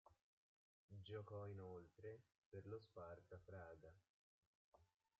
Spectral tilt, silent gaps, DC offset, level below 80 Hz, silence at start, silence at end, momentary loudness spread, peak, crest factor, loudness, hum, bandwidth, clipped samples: -6 dB/octave; 0.21-0.88 s, 2.38-2.52 s, 4.09-4.72 s; under 0.1%; -84 dBFS; 0.05 s; 0.35 s; 10 LU; -42 dBFS; 18 dB; -59 LUFS; none; 7 kHz; under 0.1%